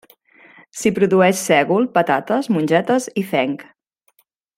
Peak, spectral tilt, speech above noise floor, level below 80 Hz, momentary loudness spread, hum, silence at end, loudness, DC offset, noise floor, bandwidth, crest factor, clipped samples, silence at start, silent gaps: -2 dBFS; -5 dB/octave; 45 dB; -62 dBFS; 7 LU; none; 0.95 s; -17 LUFS; under 0.1%; -62 dBFS; 16.5 kHz; 16 dB; under 0.1%; 0.75 s; none